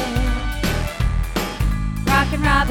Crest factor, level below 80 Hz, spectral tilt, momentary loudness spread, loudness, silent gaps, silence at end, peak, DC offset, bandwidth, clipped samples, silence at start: 16 dB; -22 dBFS; -5 dB/octave; 6 LU; -21 LUFS; none; 0 s; -4 dBFS; under 0.1%; 17.5 kHz; under 0.1%; 0 s